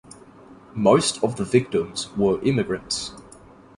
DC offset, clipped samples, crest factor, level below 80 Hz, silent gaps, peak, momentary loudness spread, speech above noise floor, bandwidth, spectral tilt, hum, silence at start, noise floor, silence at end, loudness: under 0.1%; under 0.1%; 20 dB; -52 dBFS; none; -4 dBFS; 10 LU; 26 dB; 11.5 kHz; -5 dB/octave; none; 0.5 s; -48 dBFS; 0.55 s; -22 LUFS